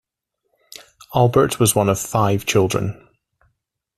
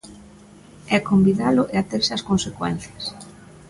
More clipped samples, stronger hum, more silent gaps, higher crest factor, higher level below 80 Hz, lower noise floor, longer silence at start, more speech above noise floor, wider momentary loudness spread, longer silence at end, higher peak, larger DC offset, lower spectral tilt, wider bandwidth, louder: neither; neither; neither; about the same, 18 dB vs 16 dB; about the same, -50 dBFS vs -50 dBFS; first, -76 dBFS vs -46 dBFS; first, 1.1 s vs 0.05 s; first, 59 dB vs 26 dB; second, 9 LU vs 15 LU; first, 1.05 s vs 0.4 s; first, -2 dBFS vs -6 dBFS; neither; about the same, -5 dB/octave vs -5.5 dB/octave; first, 15 kHz vs 11.5 kHz; first, -18 LUFS vs -21 LUFS